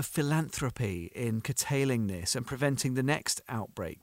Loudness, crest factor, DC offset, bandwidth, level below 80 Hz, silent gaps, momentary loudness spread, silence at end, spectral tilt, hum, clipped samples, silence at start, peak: -31 LUFS; 18 dB; under 0.1%; 16 kHz; -58 dBFS; none; 6 LU; 0.1 s; -4.5 dB/octave; none; under 0.1%; 0 s; -14 dBFS